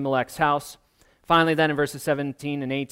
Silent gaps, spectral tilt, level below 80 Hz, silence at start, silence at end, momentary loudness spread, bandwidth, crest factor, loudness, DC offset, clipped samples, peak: none; -5 dB/octave; -56 dBFS; 0 s; 0.05 s; 9 LU; 16 kHz; 18 dB; -23 LUFS; under 0.1%; under 0.1%; -6 dBFS